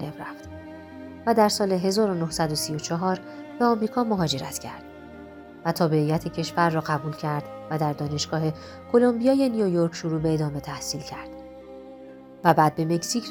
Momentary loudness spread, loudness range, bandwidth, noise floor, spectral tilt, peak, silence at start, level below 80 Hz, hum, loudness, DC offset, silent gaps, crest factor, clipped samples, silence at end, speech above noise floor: 21 LU; 3 LU; 19 kHz; -44 dBFS; -5.5 dB/octave; -4 dBFS; 0 s; -54 dBFS; none; -24 LUFS; under 0.1%; none; 22 dB; under 0.1%; 0 s; 20 dB